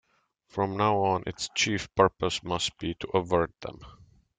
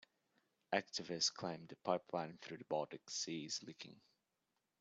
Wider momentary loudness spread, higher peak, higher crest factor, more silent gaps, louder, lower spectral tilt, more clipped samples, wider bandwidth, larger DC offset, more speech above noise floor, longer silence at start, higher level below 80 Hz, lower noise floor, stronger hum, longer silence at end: second, 10 LU vs 13 LU; first, -6 dBFS vs -22 dBFS; about the same, 22 dB vs 24 dB; neither; first, -28 LUFS vs -43 LUFS; first, -4 dB/octave vs -2.5 dB/octave; neither; first, 9.6 kHz vs 8.4 kHz; neither; second, 40 dB vs 44 dB; second, 0.55 s vs 0.7 s; first, -56 dBFS vs -88 dBFS; second, -68 dBFS vs -88 dBFS; neither; second, 0.45 s vs 0.8 s